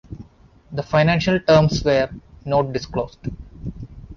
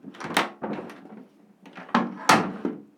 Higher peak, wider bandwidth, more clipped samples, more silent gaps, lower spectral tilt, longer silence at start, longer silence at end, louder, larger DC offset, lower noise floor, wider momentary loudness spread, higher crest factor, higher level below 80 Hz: about the same, -4 dBFS vs -2 dBFS; second, 7.2 kHz vs 19.5 kHz; neither; neither; first, -6.5 dB/octave vs -3.5 dB/octave; about the same, 0.1 s vs 0.05 s; second, 0 s vs 0.15 s; first, -19 LUFS vs -25 LUFS; neither; about the same, -50 dBFS vs -52 dBFS; about the same, 20 LU vs 22 LU; second, 18 dB vs 26 dB; first, -40 dBFS vs -70 dBFS